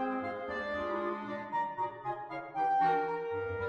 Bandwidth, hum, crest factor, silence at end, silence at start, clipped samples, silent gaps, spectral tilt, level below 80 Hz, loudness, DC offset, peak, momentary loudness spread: 6.8 kHz; none; 14 dB; 0 s; 0 s; under 0.1%; none; -7 dB/octave; -66 dBFS; -34 LUFS; under 0.1%; -20 dBFS; 10 LU